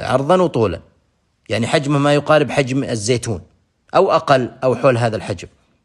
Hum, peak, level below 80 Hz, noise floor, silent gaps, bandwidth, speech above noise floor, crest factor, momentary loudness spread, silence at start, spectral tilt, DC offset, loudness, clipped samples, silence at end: none; 0 dBFS; -50 dBFS; -62 dBFS; none; 12 kHz; 46 dB; 16 dB; 11 LU; 0 s; -5.5 dB/octave; under 0.1%; -17 LUFS; under 0.1%; 0.35 s